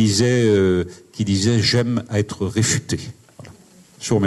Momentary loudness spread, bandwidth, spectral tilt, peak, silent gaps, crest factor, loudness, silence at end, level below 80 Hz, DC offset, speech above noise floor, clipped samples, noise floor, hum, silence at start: 12 LU; 12.5 kHz; -5 dB/octave; -6 dBFS; none; 14 dB; -19 LUFS; 0 s; -50 dBFS; under 0.1%; 29 dB; under 0.1%; -48 dBFS; none; 0 s